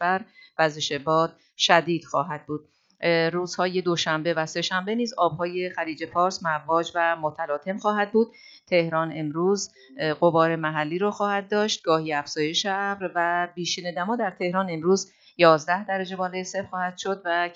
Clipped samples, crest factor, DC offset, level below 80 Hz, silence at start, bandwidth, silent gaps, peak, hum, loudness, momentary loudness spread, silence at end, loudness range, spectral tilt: under 0.1%; 22 dB; under 0.1%; -72 dBFS; 0 s; 8 kHz; none; -2 dBFS; none; -25 LUFS; 9 LU; 0 s; 2 LU; -4 dB/octave